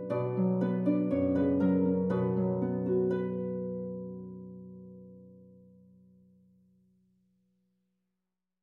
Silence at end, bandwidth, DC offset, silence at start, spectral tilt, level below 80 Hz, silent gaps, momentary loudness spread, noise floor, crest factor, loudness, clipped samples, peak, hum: 3.2 s; 4.2 kHz; under 0.1%; 0 s; -11.5 dB/octave; -72 dBFS; none; 20 LU; -88 dBFS; 16 dB; -30 LUFS; under 0.1%; -16 dBFS; none